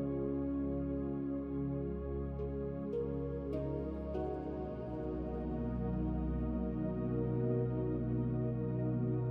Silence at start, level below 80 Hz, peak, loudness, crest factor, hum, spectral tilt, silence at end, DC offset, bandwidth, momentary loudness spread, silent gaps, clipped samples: 0 s; -46 dBFS; -22 dBFS; -38 LUFS; 14 dB; none; -12 dB/octave; 0 s; under 0.1%; 3.9 kHz; 5 LU; none; under 0.1%